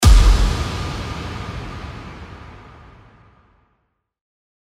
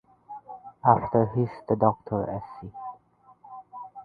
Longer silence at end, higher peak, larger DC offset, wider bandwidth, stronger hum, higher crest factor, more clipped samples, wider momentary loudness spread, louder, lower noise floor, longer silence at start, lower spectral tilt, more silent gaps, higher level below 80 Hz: first, 2.15 s vs 0 s; about the same, -2 dBFS vs -4 dBFS; neither; first, 14 kHz vs 4.9 kHz; neither; second, 18 dB vs 24 dB; neither; about the same, 25 LU vs 23 LU; first, -21 LUFS vs -25 LUFS; first, -70 dBFS vs -58 dBFS; second, 0 s vs 0.3 s; second, -5 dB/octave vs -12 dB/octave; neither; first, -20 dBFS vs -56 dBFS